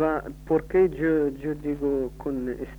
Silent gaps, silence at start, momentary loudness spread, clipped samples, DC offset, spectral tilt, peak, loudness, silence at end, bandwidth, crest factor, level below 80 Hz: none; 0 s; 9 LU; under 0.1%; under 0.1%; -9 dB/octave; -10 dBFS; -26 LUFS; 0 s; over 20 kHz; 14 dB; -44 dBFS